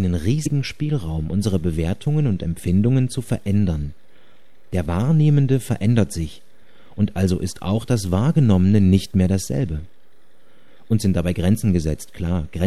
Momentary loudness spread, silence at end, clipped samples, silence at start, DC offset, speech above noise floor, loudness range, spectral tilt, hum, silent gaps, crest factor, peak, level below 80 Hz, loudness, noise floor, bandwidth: 10 LU; 0 s; under 0.1%; 0 s; 2%; 40 dB; 3 LU; -7.5 dB/octave; none; none; 16 dB; -4 dBFS; -38 dBFS; -20 LUFS; -60 dBFS; 13.5 kHz